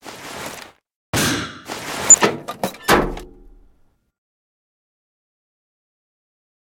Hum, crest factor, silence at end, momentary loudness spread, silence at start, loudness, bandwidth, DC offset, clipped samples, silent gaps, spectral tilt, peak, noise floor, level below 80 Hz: none; 22 dB; 3.4 s; 23 LU; 0.05 s; -16 LUFS; over 20 kHz; under 0.1%; under 0.1%; 0.95-1.13 s; -2 dB/octave; 0 dBFS; -57 dBFS; -42 dBFS